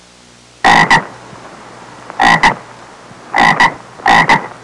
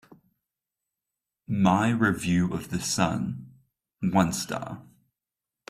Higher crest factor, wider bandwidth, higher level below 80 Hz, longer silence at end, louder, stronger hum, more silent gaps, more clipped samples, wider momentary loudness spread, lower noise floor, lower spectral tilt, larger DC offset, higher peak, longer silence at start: second, 12 dB vs 20 dB; second, 11.5 kHz vs 15 kHz; first, -40 dBFS vs -58 dBFS; second, 0.1 s vs 0.9 s; first, -10 LUFS vs -26 LUFS; neither; neither; neither; about the same, 12 LU vs 12 LU; second, -42 dBFS vs -89 dBFS; second, -3.5 dB/octave vs -5 dB/octave; neither; first, -2 dBFS vs -8 dBFS; second, 0.65 s vs 1.5 s